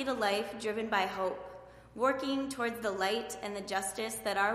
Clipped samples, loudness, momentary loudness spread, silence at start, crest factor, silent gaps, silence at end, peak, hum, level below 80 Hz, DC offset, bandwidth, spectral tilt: under 0.1%; -34 LUFS; 8 LU; 0 s; 20 dB; none; 0 s; -14 dBFS; none; -64 dBFS; under 0.1%; 15.5 kHz; -3 dB/octave